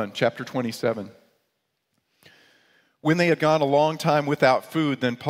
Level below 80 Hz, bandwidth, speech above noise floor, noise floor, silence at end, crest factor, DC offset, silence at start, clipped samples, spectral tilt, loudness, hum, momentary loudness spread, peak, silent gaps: -68 dBFS; 16 kHz; 53 dB; -76 dBFS; 0 s; 20 dB; under 0.1%; 0 s; under 0.1%; -6 dB/octave; -23 LUFS; none; 9 LU; -4 dBFS; none